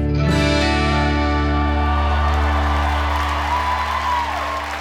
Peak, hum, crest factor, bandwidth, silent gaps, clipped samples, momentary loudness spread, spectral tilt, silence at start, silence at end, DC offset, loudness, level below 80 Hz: -4 dBFS; none; 14 dB; 11 kHz; none; under 0.1%; 4 LU; -6 dB/octave; 0 s; 0 s; under 0.1%; -19 LUFS; -22 dBFS